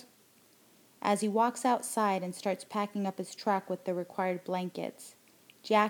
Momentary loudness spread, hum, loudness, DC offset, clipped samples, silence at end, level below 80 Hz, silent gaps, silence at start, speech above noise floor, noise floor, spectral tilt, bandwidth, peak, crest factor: 11 LU; none; -32 LUFS; under 0.1%; under 0.1%; 0 s; -88 dBFS; none; 0 s; 32 dB; -63 dBFS; -4.5 dB/octave; 20 kHz; -12 dBFS; 22 dB